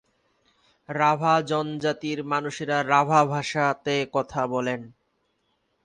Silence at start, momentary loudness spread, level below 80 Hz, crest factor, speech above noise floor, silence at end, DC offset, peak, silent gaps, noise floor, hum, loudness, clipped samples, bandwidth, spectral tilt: 0.9 s; 8 LU; -64 dBFS; 20 dB; 48 dB; 0.95 s; under 0.1%; -6 dBFS; none; -72 dBFS; none; -24 LUFS; under 0.1%; 10 kHz; -5 dB/octave